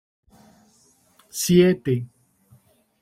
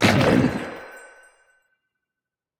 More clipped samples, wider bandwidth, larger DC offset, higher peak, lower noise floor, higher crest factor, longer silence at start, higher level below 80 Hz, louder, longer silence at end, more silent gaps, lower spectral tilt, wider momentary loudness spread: neither; about the same, 16.5 kHz vs 17 kHz; neither; about the same, -4 dBFS vs -4 dBFS; second, -60 dBFS vs -88 dBFS; about the same, 20 dB vs 20 dB; first, 1.35 s vs 0 s; second, -58 dBFS vs -48 dBFS; about the same, -20 LUFS vs -20 LUFS; second, 0.95 s vs 1.55 s; neither; about the same, -5.5 dB/octave vs -5.5 dB/octave; second, 18 LU vs 25 LU